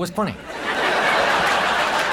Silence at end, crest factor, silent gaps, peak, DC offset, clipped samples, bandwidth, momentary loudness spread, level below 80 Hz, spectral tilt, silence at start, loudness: 0 s; 14 dB; none; -6 dBFS; under 0.1%; under 0.1%; 18 kHz; 9 LU; -50 dBFS; -3 dB/octave; 0 s; -19 LUFS